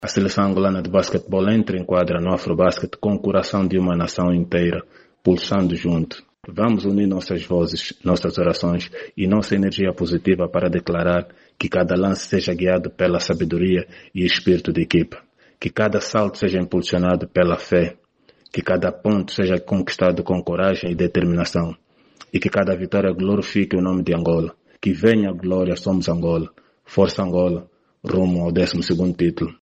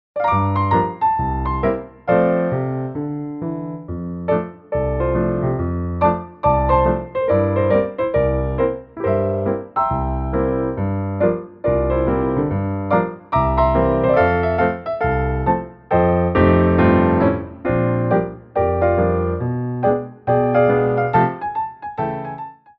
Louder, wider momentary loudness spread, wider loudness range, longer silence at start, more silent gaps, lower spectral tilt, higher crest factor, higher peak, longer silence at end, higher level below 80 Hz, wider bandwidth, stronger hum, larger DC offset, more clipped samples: about the same, -20 LUFS vs -19 LUFS; second, 6 LU vs 9 LU; second, 1 LU vs 5 LU; second, 0 s vs 0.15 s; neither; second, -6.5 dB/octave vs -11.5 dB/octave; about the same, 18 dB vs 16 dB; about the same, -2 dBFS vs -2 dBFS; second, 0.1 s vs 0.25 s; second, -46 dBFS vs -32 dBFS; first, 8.4 kHz vs 5.4 kHz; neither; neither; neither